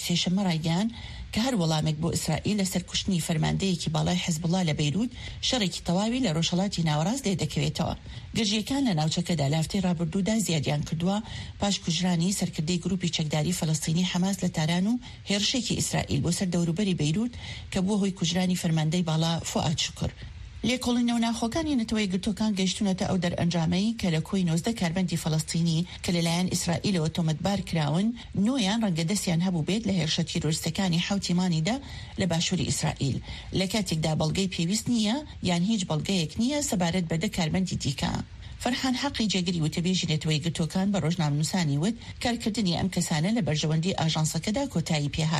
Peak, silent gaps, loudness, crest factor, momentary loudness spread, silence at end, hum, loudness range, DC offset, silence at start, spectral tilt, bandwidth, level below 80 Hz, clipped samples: -14 dBFS; none; -27 LUFS; 14 dB; 4 LU; 0 s; none; 1 LU; under 0.1%; 0 s; -5 dB/octave; 13 kHz; -48 dBFS; under 0.1%